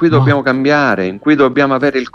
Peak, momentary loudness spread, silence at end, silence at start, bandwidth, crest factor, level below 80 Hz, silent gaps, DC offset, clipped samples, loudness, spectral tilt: 0 dBFS; 4 LU; 0.05 s; 0 s; 7 kHz; 12 dB; -48 dBFS; none; under 0.1%; under 0.1%; -12 LUFS; -7.5 dB/octave